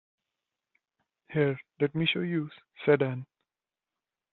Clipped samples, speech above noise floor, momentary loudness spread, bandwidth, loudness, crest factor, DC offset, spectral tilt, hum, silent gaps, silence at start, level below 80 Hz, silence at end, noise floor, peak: under 0.1%; over 62 dB; 9 LU; 4.3 kHz; -29 LUFS; 24 dB; under 0.1%; -4.5 dB/octave; none; none; 1.3 s; -72 dBFS; 1.1 s; under -90 dBFS; -8 dBFS